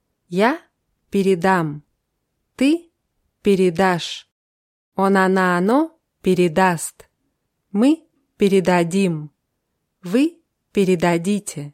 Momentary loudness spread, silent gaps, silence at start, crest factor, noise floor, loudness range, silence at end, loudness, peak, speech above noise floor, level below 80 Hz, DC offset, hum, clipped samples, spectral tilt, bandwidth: 12 LU; 4.32-4.92 s; 0.3 s; 16 dB; -74 dBFS; 3 LU; 0.05 s; -19 LUFS; -4 dBFS; 57 dB; -58 dBFS; under 0.1%; none; under 0.1%; -6 dB/octave; 15 kHz